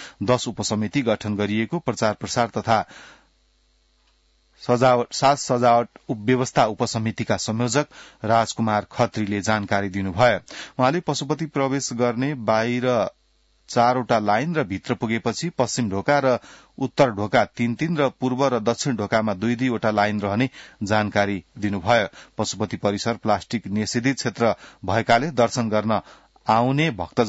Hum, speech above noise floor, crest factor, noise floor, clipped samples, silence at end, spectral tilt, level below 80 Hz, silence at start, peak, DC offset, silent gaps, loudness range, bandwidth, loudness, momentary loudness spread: none; 40 dB; 18 dB; -62 dBFS; under 0.1%; 0 s; -5 dB/octave; -58 dBFS; 0 s; -4 dBFS; under 0.1%; none; 2 LU; 8 kHz; -22 LUFS; 7 LU